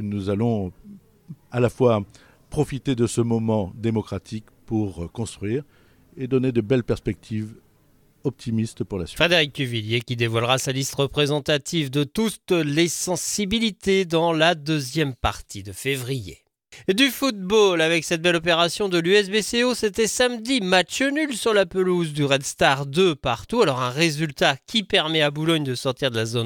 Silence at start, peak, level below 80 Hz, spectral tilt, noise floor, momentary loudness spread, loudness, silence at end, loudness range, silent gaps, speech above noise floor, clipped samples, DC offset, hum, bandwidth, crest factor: 0 s; -2 dBFS; -48 dBFS; -4.5 dB/octave; -58 dBFS; 11 LU; -22 LUFS; 0 s; 6 LU; none; 36 dB; under 0.1%; under 0.1%; none; 19 kHz; 20 dB